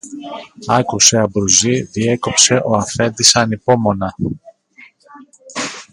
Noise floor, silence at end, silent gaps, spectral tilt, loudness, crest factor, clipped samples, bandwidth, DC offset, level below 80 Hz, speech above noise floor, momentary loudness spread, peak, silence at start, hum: -46 dBFS; 0.1 s; none; -3 dB/octave; -13 LUFS; 16 dB; under 0.1%; 16 kHz; under 0.1%; -46 dBFS; 31 dB; 19 LU; 0 dBFS; 0.05 s; none